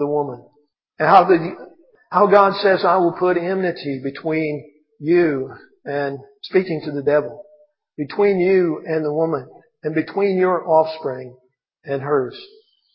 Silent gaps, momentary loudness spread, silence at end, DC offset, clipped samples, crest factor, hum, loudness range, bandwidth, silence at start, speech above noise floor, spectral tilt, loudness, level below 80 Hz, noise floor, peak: none; 16 LU; 0.5 s; under 0.1%; under 0.1%; 20 dB; none; 5 LU; 5.8 kHz; 0 s; 36 dB; -9 dB/octave; -19 LUFS; -66 dBFS; -54 dBFS; 0 dBFS